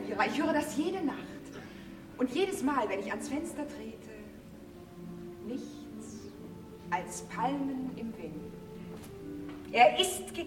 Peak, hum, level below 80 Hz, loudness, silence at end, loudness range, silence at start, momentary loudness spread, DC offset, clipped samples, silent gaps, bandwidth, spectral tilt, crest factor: -10 dBFS; none; -60 dBFS; -32 LUFS; 0 s; 10 LU; 0 s; 18 LU; under 0.1%; under 0.1%; none; 16.5 kHz; -4 dB/octave; 24 dB